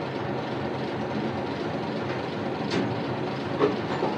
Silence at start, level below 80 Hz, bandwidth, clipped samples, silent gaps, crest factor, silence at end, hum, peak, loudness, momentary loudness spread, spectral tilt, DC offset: 0 s; -60 dBFS; 10 kHz; under 0.1%; none; 20 dB; 0 s; none; -8 dBFS; -29 LUFS; 5 LU; -7 dB/octave; under 0.1%